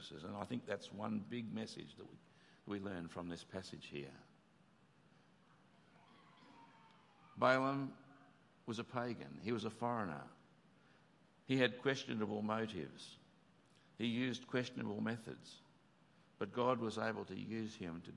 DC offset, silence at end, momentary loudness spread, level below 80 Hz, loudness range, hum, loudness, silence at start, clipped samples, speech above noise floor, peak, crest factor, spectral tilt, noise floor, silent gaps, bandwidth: under 0.1%; 0 s; 23 LU; -84 dBFS; 10 LU; none; -42 LUFS; 0 s; under 0.1%; 29 dB; -18 dBFS; 26 dB; -6 dB/octave; -70 dBFS; none; 11.5 kHz